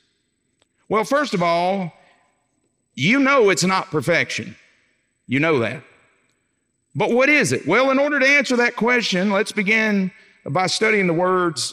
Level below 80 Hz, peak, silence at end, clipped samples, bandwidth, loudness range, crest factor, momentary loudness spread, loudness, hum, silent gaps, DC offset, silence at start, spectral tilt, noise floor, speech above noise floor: -70 dBFS; -4 dBFS; 0 s; under 0.1%; 15.5 kHz; 6 LU; 16 dB; 12 LU; -18 LUFS; none; none; under 0.1%; 0.9 s; -4.5 dB/octave; -70 dBFS; 52 dB